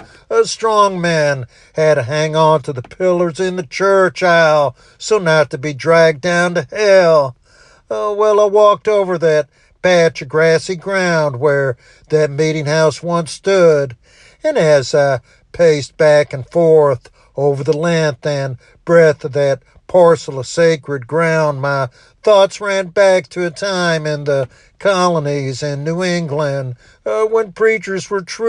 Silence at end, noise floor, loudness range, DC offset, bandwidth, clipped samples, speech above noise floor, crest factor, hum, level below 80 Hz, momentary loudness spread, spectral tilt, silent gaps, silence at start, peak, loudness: 0 s; -48 dBFS; 3 LU; under 0.1%; 10.5 kHz; under 0.1%; 34 dB; 14 dB; none; -54 dBFS; 10 LU; -5 dB/octave; none; 0.3 s; 0 dBFS; -14 LUFS